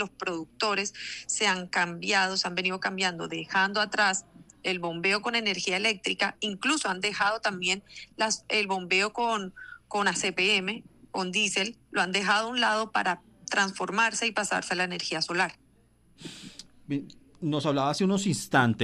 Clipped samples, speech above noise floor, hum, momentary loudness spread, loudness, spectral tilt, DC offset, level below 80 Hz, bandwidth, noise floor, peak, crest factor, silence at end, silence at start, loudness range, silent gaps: under 0.1%; 34 dB; none; 11 LU; -27 LUFS; -3 dB/octave; under 0.1%; -68 dBFS; 13.5 kHz; -62 dBFS; -10 dBFS; 20 dB; 0 s; 0 s; 3 LU; none